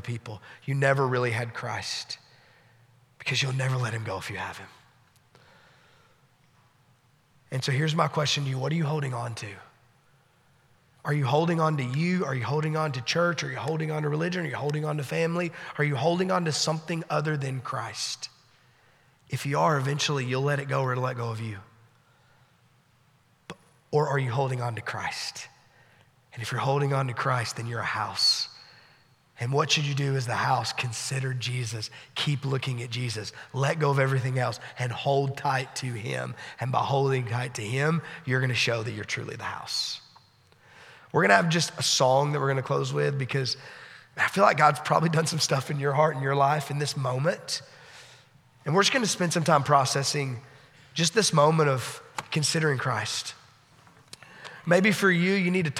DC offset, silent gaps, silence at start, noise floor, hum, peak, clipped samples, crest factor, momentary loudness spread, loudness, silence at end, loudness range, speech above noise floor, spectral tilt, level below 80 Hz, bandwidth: under 0.1%; none; 0 s; -63 dBFS; none; -4 dBFS; under 0.1%; 24 dB; 14 LU; -27 LUFS; 0 s; 7 LU; 37 dB; -4.5 dB/octave; -72 dBFS; 15 kHz